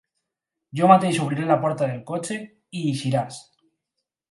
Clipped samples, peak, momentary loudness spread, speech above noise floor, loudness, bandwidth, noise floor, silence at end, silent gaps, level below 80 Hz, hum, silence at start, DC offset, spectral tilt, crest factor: under 0.1%; 0 dBFS; 18 LU; 62 dB; -22 LUFS; 11.5 kHz; -84 dBFS; 0.9 s; none; -70 dBFS; none; 0.75 s; under 0.1%; -6 dB/octave; 22 dB